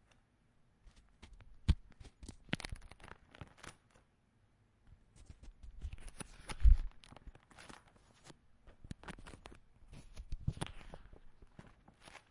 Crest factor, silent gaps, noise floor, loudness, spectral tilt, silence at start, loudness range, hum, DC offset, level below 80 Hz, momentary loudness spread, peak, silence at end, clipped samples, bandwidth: 26 dB; none; -73 dBFS; -41 LUFS; -5.5 dB/octave; 1.7 s; 15 LU; none; under 0.1%; -42 dBFS; 24 LU; -14 dBFS; 1.3 s; under 0.1%; 11.5 kHz